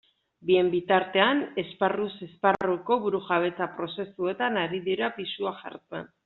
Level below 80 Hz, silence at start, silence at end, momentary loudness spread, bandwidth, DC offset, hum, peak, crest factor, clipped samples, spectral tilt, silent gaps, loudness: -68 dBFS; 0.45 s; 0.2 s; 11 LU; 4.2 kHz; under 0.1%; none; -6 dBFS; 20 dB; under 0.1%; -3 dB/octave; none; -27 LUFS